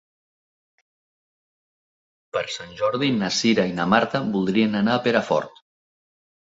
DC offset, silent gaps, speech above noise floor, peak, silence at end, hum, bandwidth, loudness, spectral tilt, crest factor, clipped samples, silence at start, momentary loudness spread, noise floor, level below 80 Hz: under 0.1%; none; over 69 dB; -2 dBFS; 1.1 s; none; 7.8 kHz; -22 LUFS; -5 dB/octave; 22 dB; under 0.1%; 2.35 s; 9 LU; under -90 dBFS; -60 dBFS